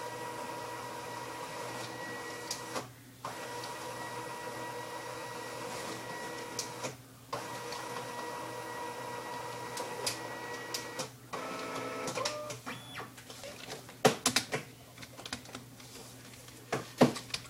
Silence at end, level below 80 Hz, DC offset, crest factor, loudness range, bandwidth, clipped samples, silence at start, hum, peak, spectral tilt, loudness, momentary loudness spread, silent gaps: 0 s; -70 dBFS; under 0.1%; 28 dB; 6 LU; 16 kHz; under 0.1%; 0 s; none; -10 dBFS; -3 dB/octave; -38 LUFS; 16 LU; none